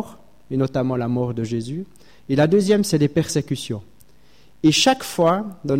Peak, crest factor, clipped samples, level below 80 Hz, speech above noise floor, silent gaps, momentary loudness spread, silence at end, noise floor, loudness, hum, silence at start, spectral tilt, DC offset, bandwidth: -4 dBFS; 16 dB; under 0.1%; -54 dBFS; 35 dB; none; 14 LU; 0 s; -55 dBFS; -20 LUFS; none; 0 s; -5 dB/octave; 0.4%; 16.5 kHz